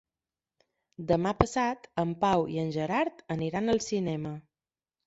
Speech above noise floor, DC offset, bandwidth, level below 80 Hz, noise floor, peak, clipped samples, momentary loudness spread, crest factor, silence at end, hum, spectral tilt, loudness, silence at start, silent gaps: over 61 dB; under 0.1%; 8 kHz; -52 dBFS; under -90 dBFS; -2 dBFS; under 0.1%; 8 LU; 28 dB; 0.65 s; none; -6 dB/octave; -29 LUFS; 1 s; none